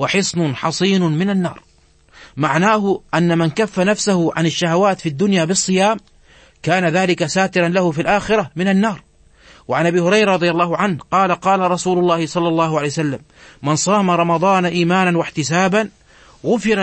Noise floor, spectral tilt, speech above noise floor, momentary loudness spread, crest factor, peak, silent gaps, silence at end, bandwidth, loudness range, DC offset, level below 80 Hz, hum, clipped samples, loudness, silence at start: -49 dBFS; -5 dB/octave; 33 dB; 6 LU; 16 dB; -2 dBFS; none; 0 s; 8.8 kHz; 2 LU; under 0.1%; -52 dBFS; none; under 0.1%; -17 LUFS; 0 s